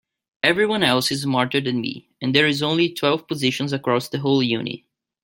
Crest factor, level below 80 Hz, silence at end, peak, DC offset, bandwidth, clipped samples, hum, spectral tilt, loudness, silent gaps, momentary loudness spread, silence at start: 20 dB; -62 dBFS; 0.45 s; -2 dBFS; under 0.1%; 17 kHz; under 0.1%; none; -4.5 dB/octave; -20 LUFS; none; 8 LU; 0.45 s